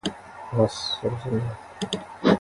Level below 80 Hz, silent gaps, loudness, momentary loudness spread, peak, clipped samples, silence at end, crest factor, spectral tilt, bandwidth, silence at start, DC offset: -52 dBFS; none; -27 LUFS; 10 LU; -4 dBFS; under 0.1%; 0 s; 22 dB; -6 dB/octave; 11.5 kHz; 0.05 s; under 0.1%